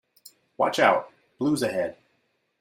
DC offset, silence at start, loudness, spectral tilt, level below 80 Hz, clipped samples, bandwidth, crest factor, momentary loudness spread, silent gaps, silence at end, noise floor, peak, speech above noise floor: under 0.1%; 0.25 s; -25 LUFS; -4.5 dB/octave; -68 dBFS; under 0.1%; 16 kHz; 20 dB; 9 LU; none; 0.7 s; -72 dBFS; -6 dBFS; 48 dB